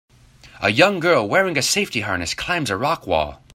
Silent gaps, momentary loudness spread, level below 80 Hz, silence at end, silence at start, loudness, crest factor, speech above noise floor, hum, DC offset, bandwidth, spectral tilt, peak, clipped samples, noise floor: none; 7 LU; -48 dBFS; 0.2 s; 0.45 s; -19 LUFS; 20 dB; 28 dB; none; under 0.1%; 16 kHz; -3.5 dB/octave; 0 dBFS; under 0.1%; -47 dBFS